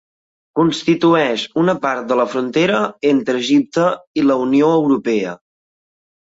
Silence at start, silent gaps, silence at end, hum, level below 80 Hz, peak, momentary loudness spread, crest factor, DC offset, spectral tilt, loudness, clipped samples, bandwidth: 0.55 s; 4.07-4.14 s; 1.05 s; none; -60 dBFS; -2 dBFS; 6 LU; 14 dB; under 0.1%; -6 dB/octave; -16 LUFS; under 0.1%; 8 kHz